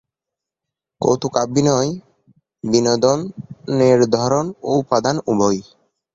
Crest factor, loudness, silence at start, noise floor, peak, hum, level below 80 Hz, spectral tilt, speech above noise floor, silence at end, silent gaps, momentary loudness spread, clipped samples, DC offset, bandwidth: 18 dB; -18 LUFS; 1 s; -85 dBFS; 0 dBFS; none; -54 dBFS; -5.5 dB/octave; 68 dB; 0.5 s; none; 10 LU; under 0.1%; under 0.1%; 8 kHz